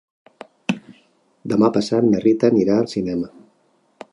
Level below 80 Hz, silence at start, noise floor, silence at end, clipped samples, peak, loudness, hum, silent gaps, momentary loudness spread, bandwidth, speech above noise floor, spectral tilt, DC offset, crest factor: -56 dBFS; 0.7 s; -62 dBFS; 0.85 s; under 0.1%; -2 dBFS; -19 LUFS; none; none; 13 LU; 11 kHz; 44 dB; -7 dB/octave; under 0.1%; 18 dB